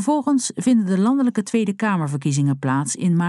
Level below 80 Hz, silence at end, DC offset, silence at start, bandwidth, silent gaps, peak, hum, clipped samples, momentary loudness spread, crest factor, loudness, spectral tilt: -68 dBFS; 0 s; under 0.1%; 0 s; 12 kHz; none; -8 dBFS; none; under 0.1%; 4 LU; 12 dB; -20 LUFS; -6 dB/octave